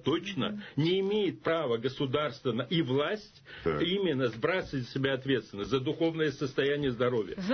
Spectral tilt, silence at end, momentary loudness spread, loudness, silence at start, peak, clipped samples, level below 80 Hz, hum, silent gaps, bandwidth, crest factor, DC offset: -6.5 dB/octave; 0 s; 5 LU; -31 LUFS; 0.05 s; -16 dBFS; under 0.1%; -60 dBFS; none; none; 6.6 kHz; 14 dB; under 0.1%